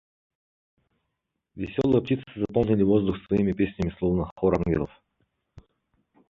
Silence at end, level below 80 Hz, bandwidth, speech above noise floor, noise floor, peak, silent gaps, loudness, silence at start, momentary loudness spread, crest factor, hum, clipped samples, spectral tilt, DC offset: 1.45 s; -46 dBFS; 7 kHz; 57 dB; -81 dBFS; -8 dBFS; 4.31-4.36 s; -25 LUFS; 1.55 s; 7 LU; 20 dB; none; under 0.1%; -9.5 dB/octave; under 0.1%